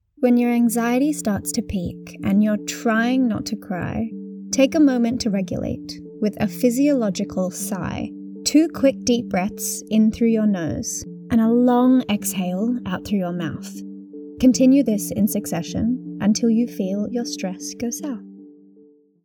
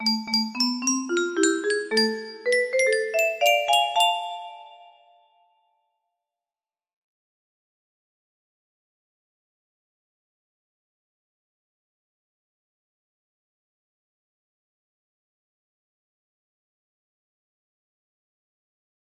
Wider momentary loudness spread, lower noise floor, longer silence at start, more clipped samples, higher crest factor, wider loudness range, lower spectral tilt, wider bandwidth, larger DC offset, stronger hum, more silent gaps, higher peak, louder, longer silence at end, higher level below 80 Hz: first, 12 LU vs 8 LU; second, -52 dBFS vs under -90 dBFS; first, 0.2 s vs 0 s; neither; about the same, 18 dB vs 22 dB; second, 3 LU vs 7 LU; first, -5 dB/octave vs -1.5 dB/octave; first, 19 kHz vs 15.5 kHz; neither; neither; neither; first, -4 dBFS vs -8 dBFS; about the same, -21 LUFS vs -22 LUFS; second, 0.7 s vs 14.15 s; first, -50 dBFS vs -80 dBFS